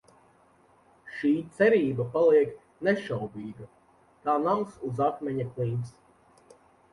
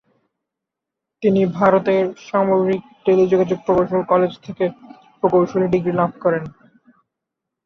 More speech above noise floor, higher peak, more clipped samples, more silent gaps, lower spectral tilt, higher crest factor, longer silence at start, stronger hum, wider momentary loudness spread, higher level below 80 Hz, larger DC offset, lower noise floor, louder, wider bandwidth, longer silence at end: second, 35 dB vs 66 dB; second, -10 dBFS vs -2 dBFS; neither; neither; about the same, -8 dB/octave vs -8.5 dB/octave; about the same, 18 dB vs 16 dB; second, 1.05 s vs 1.2 s; neither; first, 17 LU vs 8 LU; second, -66 dBFS vs -56 dBFS; neither; second, -61 dBFS vs -83 dBFS; second, -27 LUFS vs -18 LUFS; first, 11.5 kHz vs 6.4 kHz; second, 1 s vs 1.15 s